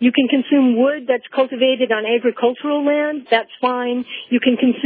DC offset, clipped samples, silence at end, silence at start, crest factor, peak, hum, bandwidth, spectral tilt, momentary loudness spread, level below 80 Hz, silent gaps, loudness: under 0.1%; under 0.1%; 0 s; 0 s; 14 dB; -2 dBFS; none; 4.8 kHz; -8 dB/octave; 6 LU; -82 dBFS; none; -17 LUFS